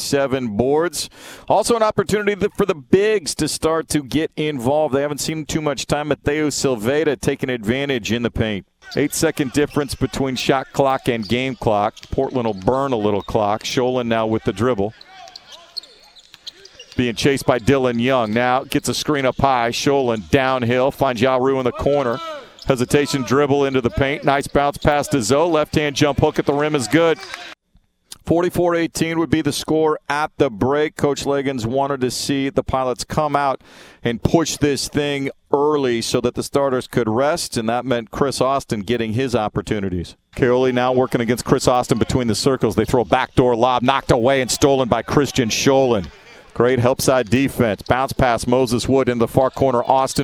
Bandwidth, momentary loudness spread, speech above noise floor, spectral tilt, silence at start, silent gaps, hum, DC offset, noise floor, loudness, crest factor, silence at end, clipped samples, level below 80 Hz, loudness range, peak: 19 kHz; 6 LU; 41 dB; -5 dB/octave; 0 s; none; none; under 0.1%; -59 dBFS; -19 LUFS; 18 dB; 0 s; under 0.1%; -40 dBFS; 3 LU; 0 dBFS